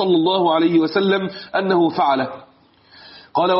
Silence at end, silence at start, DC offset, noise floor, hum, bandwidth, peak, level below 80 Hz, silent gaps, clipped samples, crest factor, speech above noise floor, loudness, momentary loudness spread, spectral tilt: 0 s; 0 s; under 0.1%; -51 dBFS; none; 5.8 kHz; -6 dBFS; -66 dBFS; none; under 0.1%; 12 dB; 34 dB; -18 LUFS; 8 LU; -4 dB/octave